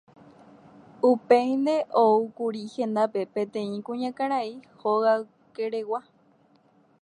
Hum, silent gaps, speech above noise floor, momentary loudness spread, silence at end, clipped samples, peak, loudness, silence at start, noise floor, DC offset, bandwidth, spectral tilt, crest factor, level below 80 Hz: none; none; 37 dB; 12 LU; 1 s; under 0.1%; -6 dBFS; -26 LUFS; 1.05 s; -61 dBFS; under 0.1%; 10.5 kHz; -6.5 dB/octave; 20 dB; -80 dBFS